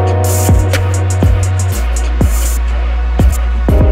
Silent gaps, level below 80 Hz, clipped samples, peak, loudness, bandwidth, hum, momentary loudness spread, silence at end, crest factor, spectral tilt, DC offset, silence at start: none; -14 dBFS; under 0.1%; 0 dBFS; -13 LUFS; 16.5 kHz; none; 5 LU; 0 s; 10 dB; -6 dB/octave; under 0.1%; 0 s